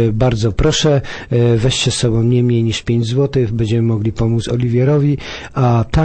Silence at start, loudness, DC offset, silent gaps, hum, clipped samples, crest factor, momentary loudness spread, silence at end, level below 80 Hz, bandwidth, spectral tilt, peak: 0 s; -15 LUFS; under 0.1%; none; none; under 0.1%; 12 dB; 4 LU; 0 s; -30 dBFS; 8.8 kHz; -6 dB/octave; -2 dBFS